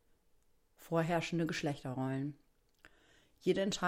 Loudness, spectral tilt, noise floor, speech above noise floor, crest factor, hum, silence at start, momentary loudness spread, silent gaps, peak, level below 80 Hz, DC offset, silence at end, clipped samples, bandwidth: -37 LUFS; -5.5 dB/octave; -70 dBFS; 35 dB; 18 dB; none; 0.8 s; 6 LU; none; -20 dBFS; -66 dBFS; under 0.1%; 0 s; under 0.1%; 16 kHz